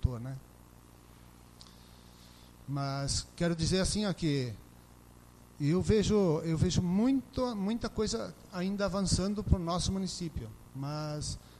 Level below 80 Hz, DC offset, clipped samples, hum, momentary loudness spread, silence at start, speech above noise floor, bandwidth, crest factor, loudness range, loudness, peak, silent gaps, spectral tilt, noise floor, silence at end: -46 dBFS; under 0.1%; under 0.1%; 60 Hz at -55 dBFS; 13 LU; 0 s; 24 dB; 13.5 kHz; 22 dB; 5 LU; -32 LUFS; -12 dBFS; none; -5.5 dB/octave; -56 dBFS; 0.05 s